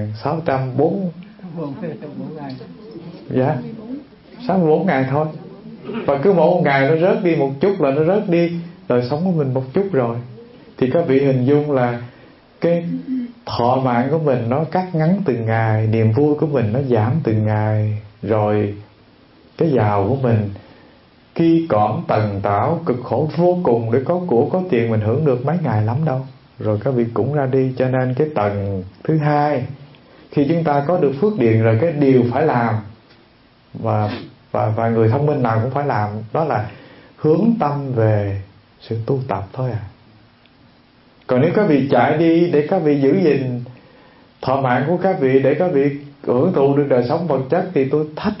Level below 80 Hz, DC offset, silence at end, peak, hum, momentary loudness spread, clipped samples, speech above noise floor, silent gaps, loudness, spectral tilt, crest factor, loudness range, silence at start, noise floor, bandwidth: -54 dBFS; under 0.1%; 0 s; -2 dBFS; none; 14 LU; under 0.1%; 34 dB; none; -18 LUFS; -12 dB/octave; 16 dB; 4 LU; 0 s; -51 dBFS; 5.8 kHz